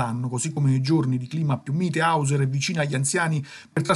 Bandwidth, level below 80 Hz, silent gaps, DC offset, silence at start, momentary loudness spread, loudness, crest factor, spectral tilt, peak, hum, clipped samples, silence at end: 12 kHz; -66 dBFS; none; under 0.1%; 0 s; 5 LU; -24 LUFS; 18 dB; -5.5 dB/octave; -6 dBFS; none; under 0.1%; 0 s